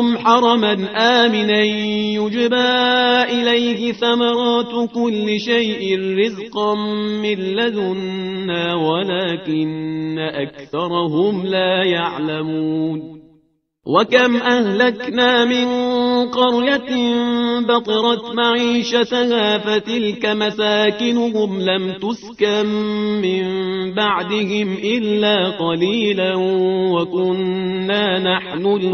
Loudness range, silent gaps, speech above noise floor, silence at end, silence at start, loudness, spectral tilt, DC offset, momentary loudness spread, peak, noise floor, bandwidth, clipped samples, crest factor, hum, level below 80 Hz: 4 LU; none; 42 dB; 0 s; 0 s; -17 LUFS; -5.5 dB/octave; under 0.1%; 7 LU; 0 dBFS; -59 dBFS; 6.6 kHz; under 0.1%; 16 dB; none; -58 dBFS